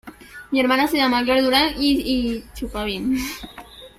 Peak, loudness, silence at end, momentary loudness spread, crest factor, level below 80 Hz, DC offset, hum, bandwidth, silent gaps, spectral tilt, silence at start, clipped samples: -2 dBFS; -20 LUFS; 0.1 s; 19 LU; 18 dB; -42 dBFS; under 0.1%; none; 16 kHz; none; -3.5 dB/octave; 0.05 s; under 0.1%